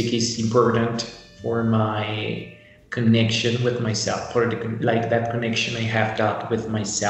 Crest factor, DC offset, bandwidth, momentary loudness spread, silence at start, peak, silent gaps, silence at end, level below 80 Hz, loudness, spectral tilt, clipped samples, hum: 18 dB; under 0.1%; 8.4 kHz; 10 LU; 0 s; -6 dBFS; none; 0 s; -56 dBFS; -22 LUFS; -5 dB/octave; under 0.1%; none